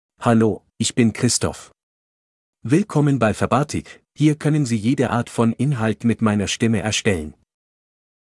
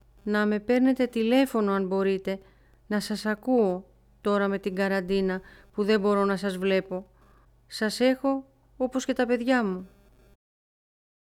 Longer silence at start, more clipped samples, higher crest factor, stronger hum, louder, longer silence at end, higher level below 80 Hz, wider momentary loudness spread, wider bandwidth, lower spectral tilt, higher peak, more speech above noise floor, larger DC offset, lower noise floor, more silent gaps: about the same, 0.2 s vs 0.25 s; neither; about the same, 18 dB vs 18 dB; neither; first, -20 LUFS vs -26 LUFS; second, 0.95 s vs 1.45 s; first, -52 dBFS vs -58 dBFS; about the same, 8 LU vs 10 LU; second, 12 kHz vs 16 kHz; about the same, -5.5 dB/octave vs -6 dB/octave; first, -2 dBFS vs -10 dBFS; first, over 71 dB vs 33 dB; neither; first, under -90 dBFS vs -58 dBFS; first, 1.83-2.53 s vs none